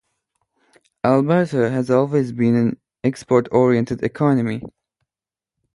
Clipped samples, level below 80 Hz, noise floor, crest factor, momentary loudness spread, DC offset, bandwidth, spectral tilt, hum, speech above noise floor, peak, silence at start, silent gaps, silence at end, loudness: under 0.1%; -56 dBFS; under -90 dBFS; 18 dB; 8 LU; under 0.1%; 11.5 kHz; -8.5 dB/octave; none; over 72 dB; -2 dBFS; 1.05 s; none; 1.05 s; -19 LUFS